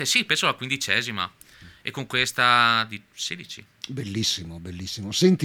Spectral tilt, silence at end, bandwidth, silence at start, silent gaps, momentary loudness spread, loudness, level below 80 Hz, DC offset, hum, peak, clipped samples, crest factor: -3 dB/octave; 0 s; 19 kHz; 0 s; none; 17 LU; -23 LUFS; -58 dBFS; under 0.1%; none; -4 dBFS; under 0.1%; 22 dB